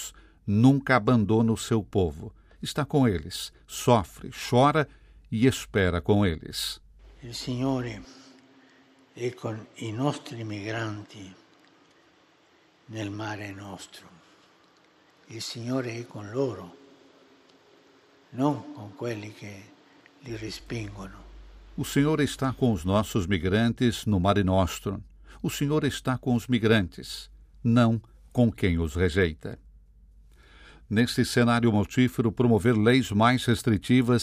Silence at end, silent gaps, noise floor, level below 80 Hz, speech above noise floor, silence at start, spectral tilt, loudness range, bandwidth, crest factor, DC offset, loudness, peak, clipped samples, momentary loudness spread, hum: 0 s; none; -61 dBFS; -50 dBFS; 36 dB; 0 s; -6 dB/octave; 13 LU; 15.5 kHz; 22 dB; under 0.1%; -26 LUFS; -6 dBFS; under 0.1%; 18 LU; none